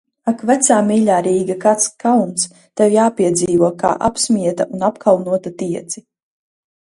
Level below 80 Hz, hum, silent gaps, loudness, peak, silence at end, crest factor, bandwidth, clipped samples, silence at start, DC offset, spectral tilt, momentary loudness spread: -54 dBFS; none; none; -16 LUFS; 0 dBFS; 0.8 s; 16 dB; 11.5 kHz; under 0.1%; 0.25 s; under 0.1%; -4.5 dB/octave; 9 LU